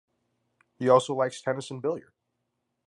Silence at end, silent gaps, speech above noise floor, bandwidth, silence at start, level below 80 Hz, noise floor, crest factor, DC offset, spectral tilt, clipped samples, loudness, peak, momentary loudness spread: 0.85 s; none; 54 dB; 11.5 kHz; 0.8 s; -78 dBFS; -80 dBFS; 22 dB; under 0.1%; -5.5 dB/octave; under 0.1%; -27 LUFS; -8 dBFS; 10 LU